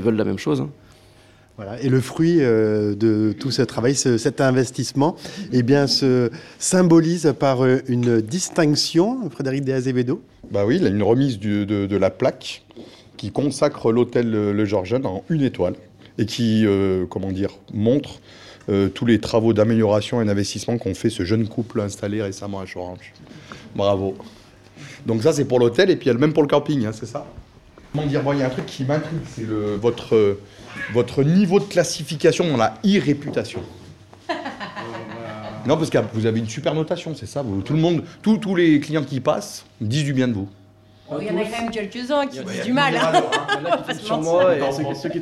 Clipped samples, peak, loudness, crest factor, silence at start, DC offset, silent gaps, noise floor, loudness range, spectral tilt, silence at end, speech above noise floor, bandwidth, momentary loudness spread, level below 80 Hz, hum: under 0.1%; -4 dBFS; -20 LUFS; 18 dB; 0 s; under 0.1%; none; -50 dBFS; 6 LU; -6 dB/octave; 0 s; 30 dB; 13 kHz; 14 LU; -54 dBFS; none